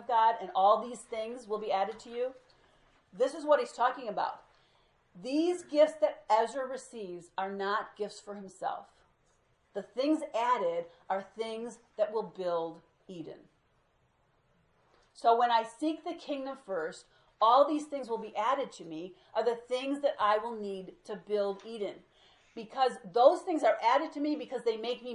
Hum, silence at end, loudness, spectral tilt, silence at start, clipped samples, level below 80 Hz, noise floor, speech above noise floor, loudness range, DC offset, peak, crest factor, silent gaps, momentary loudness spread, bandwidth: none; 0 s; -31 LUFS; -4.5 dB/octave; 0 s; under 0.1%; -78 dBFS; -71 dBFS; 40 dB; 8 LU; under 0.1%; -10 dBFS; 22 dB; none; 17 LU; 11.5 kHz